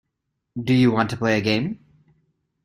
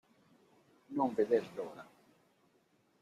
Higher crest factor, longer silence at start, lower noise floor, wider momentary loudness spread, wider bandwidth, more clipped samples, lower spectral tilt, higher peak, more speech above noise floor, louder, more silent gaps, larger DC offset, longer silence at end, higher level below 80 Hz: about the same, 20 dB vs 22 dB; second, 0.55 s vs 0.9 s; first, -78 dBFS vs -73 dBFS; about the same, 16 LU vs 15 LU; first, 15 kHz vs 12.5 kHz; neither; about the same, -6.5 dB/octave vs -7 dB/octave; first, -4 dBFS vs -18 dBFS; first, 58 dB vs 38 dB; first, -21 LUFS vs -35 LUFS; neither; neither; second, 0.9 s vs 1.2 s; first, -56 dBFS vs -82 dBFS